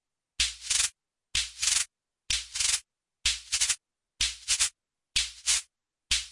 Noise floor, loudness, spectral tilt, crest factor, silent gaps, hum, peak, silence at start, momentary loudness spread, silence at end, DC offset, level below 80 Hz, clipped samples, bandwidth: -60 dBFS; -27 LUFS; 3 dB/octave; 22 dB; none; none; -10 dBFS; 0.4 s; 5 LU; 0 s; under 0.1%; -50 dBFS; under 0.1%; 11.5 kHz